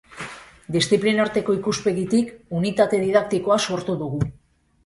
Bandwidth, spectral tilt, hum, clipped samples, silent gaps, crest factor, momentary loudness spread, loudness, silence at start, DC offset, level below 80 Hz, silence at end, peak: 11.5 kHz; -5 dB/octave; none; under 0.1%; none; 18 dB; 10 LU; -22 LUFS; 0.1 s; under 0.1%; -52 dBFS; 0.55 s; -4 dBFS